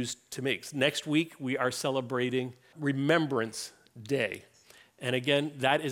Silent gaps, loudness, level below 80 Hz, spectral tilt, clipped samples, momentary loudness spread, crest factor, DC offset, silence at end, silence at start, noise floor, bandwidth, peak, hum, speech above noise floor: none; -30 LUFS; -76 dBFS; -4.5 dB/octave; under 0.1%; 10 LU; 20 dB; under 0.1%; 0 s; 0 s; -58 dBFS; 17.5 kHz; -12 dBFS; none; 28 dB